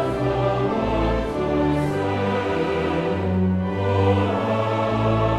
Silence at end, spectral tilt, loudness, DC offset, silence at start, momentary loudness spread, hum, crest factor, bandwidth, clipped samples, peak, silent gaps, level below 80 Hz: 0 s; -8 dB/octave; -22 LUFS; under 0.1%; 0 s; 3 LU; none; 14 dB; 11 kHz; under 0.1%; -8 dBFS; none; -36 dBFS